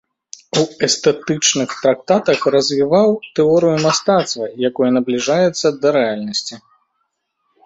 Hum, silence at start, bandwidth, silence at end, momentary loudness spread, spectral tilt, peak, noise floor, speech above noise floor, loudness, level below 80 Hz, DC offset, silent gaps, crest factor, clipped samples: none; 0.55 s; 8 kHz; 1.05 s; 7 LU; -4 dB/octave; 0 dBFS; -70 dBFS; 55 dB; -16 LUFS; -58 dBFS; under 0.1%; none; 16 dB; under 0.1%